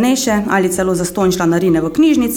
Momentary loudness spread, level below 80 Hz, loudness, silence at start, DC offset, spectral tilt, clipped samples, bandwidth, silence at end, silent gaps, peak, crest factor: 3 LU; -40 dBFS; -14 LUFS; 0 s; under 0.1%; -5 dB/octave; under 0.1%; 18.5 kHz; 0 s; none; -2 dBFS; 10 dB